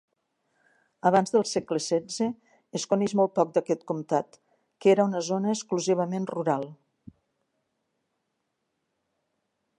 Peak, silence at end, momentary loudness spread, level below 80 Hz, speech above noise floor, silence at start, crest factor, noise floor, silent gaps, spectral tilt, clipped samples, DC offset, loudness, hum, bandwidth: -8 dBFS; 3.05 s; 8 LU; -74 dBFS; 54 dB; 1.05 s; 20 dB; -79 dBFS; none; -5.5 dB/octave; under 0.1%; under 0.1%; -26 LUFS; none; 11.5 kHz